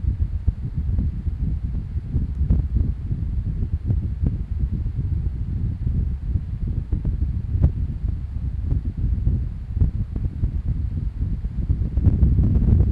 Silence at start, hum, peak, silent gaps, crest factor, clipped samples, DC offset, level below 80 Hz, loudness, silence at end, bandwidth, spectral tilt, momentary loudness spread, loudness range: 0 s; none; -4 dBFS; none; 18 dB; under 0.1%; under 0.1%; -24 dBFS; -25 LUFS; 0 s; 2.8 kHz; -11.5 dB/octave; 8 LU; 2 LU